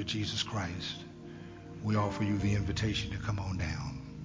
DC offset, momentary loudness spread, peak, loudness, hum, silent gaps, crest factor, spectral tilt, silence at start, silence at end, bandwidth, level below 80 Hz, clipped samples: under 0.1%; 16 LU; -16 dBFS; -34 LUFS; none; none; 18 dB; -5.5 dB/octave; 0 s; 0 s; 7.6 kHz; -46 dBFS; under 0.1%